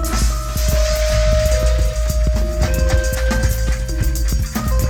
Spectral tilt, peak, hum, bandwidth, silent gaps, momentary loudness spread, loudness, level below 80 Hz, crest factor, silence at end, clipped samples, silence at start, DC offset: -5 dB/octave; -2 dBFS; none; 17.5 kHz; none; 4 LU; -18 LUFS; -18 dBFS; 14 dB; 0 s; under 0.1%; 0 s; under 0.1%